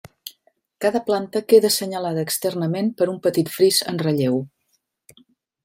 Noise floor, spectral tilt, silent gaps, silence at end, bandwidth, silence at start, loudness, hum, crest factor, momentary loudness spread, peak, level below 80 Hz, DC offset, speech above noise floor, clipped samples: -70 dBFS; -4.5 dB/octave; none; 1.15 s; 16.5 kHz; 0.25 s; -20 LUFS; none; 18 dB; 10 LU; -2 dBFS; -68 dBFS; under 0.1%; 50 dB; under 0.1%